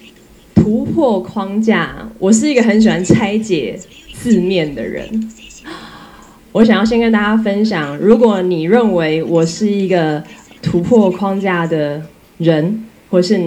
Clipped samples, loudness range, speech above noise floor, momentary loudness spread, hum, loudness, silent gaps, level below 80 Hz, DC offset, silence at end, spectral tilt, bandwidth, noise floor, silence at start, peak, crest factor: 0.2%; 4 LU; 29 dB; 13 LU; none; -14 LUFS; none; -44 dBFS; under 0.1%; 0 s; -6 dB/octave; 11.5 kHz; -42 dBFS; 0.55 s; 0 dBFS; 14 dB